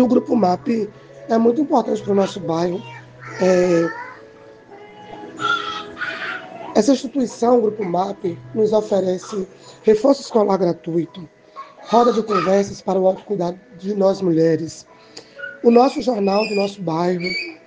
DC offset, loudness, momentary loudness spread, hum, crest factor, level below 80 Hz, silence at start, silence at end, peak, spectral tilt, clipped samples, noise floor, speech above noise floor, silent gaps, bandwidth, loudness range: under 0.1%; -19 LUFS; 18 LU; none; 20 dB; -60 dBFS; 0 s; 0.1 s; 0 dBFS; -6 dB/octave; under 0.1%; -43 dBFS; 25 dB; none; 9.6 kHz; 4 LU